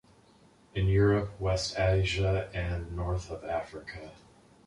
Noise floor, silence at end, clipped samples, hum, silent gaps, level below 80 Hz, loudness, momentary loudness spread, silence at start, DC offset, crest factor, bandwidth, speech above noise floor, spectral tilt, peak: -60 dBFS; 0.55 s; under 0.1%; none; none; -42 dBFS; -30 LUFS; 17 LU; 0.75 s; under 0.1%; 16 dB; 11 kHz; 31 dB; -6 dB/octave; -14 dBFS